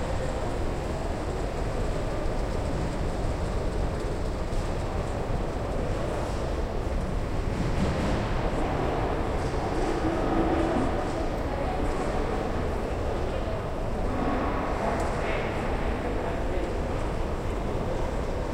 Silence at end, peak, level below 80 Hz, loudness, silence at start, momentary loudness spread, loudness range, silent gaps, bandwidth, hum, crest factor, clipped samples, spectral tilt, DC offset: 0 s; -14 dBFS; -32 dBFS; -30 LUFS; 0 s; 4 LU; 3 LU; none; 12.5 kHz; none; 14 dB; under 0.1%; -6.5 dB/octave; under 0.1%